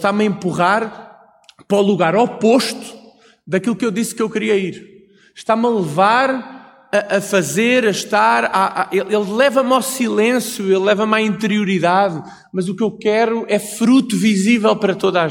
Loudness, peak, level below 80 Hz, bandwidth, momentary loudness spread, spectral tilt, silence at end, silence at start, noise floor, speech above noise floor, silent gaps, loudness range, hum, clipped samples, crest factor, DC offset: -16 LUFS; -2 dBFS; -62 dBFS; 17 kHz; 7 LU; -5 dB/octave; 0 s; 0 s; -48 dBFS; 32 dB; none; 3 LU; none; under 0.1%; 16 dB; under 0.1%